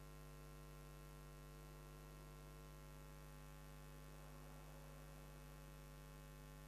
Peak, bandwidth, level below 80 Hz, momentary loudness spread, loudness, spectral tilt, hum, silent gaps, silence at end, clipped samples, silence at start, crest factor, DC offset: -44 dBFS; 14.5 kHz; -62 dBFS; 0 LU; -60 LUFS; -5 dB/octave; none; none; 0 s; under 0.1%; 0 s; 14 dB; under 0.1%